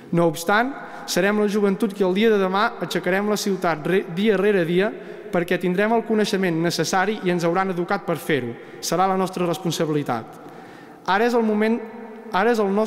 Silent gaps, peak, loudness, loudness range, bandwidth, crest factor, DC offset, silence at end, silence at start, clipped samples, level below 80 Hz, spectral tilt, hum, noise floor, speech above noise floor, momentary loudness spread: none; -6 dBFS; -21 LUFS; 3 LU; 16 kHz; 14 dB; under 0.1%; 0 s; 0 s; under 0.1%; -60 dBFS; -5 dB/octave; none; -42 dBFS; 21 dB; 8 LU